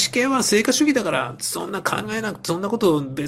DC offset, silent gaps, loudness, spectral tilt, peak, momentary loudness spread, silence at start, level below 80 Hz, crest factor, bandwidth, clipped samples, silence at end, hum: under 0.1%; none; -21 LUFS; -3.5 dB/octave; -4 dBFS; 8 LU; 0 s; -56 dBFS; 16 dB; 16.5 kHz; under 0.1%; 0 s; none